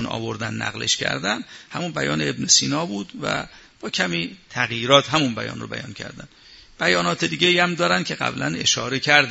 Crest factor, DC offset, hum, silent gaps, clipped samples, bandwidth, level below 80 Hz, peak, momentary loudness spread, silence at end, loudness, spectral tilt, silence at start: 22 dB; under 0.1%; none; none; under 0.1%; 8 kHz; -56 dBFS; 0 dBFS; 14 LU; 0 s; -21 LUFS; -2.5 dB/octave; 0 s